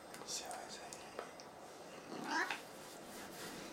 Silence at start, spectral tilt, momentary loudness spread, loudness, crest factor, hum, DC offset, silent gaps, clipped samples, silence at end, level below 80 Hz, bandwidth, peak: 0 s; -2 dB/octave; 14 LU; -46 LUFS; 24 dB; none; under 0.1%; none; under 0.1%; 0 s; -78 dBFS; 16 kHz; -22 dBFS